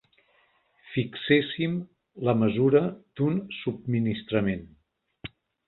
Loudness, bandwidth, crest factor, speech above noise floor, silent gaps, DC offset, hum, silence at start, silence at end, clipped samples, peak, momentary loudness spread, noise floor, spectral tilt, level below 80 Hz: -27 LUFS; 4.2 kHz; 20 dB; 40 dB; none; under 0.1%; none; 0.85 s; 0.4 s; under 0.1%; -8 dBFS; 19 LU; -66 dBFS; -11 dB/octave; -58 dBFS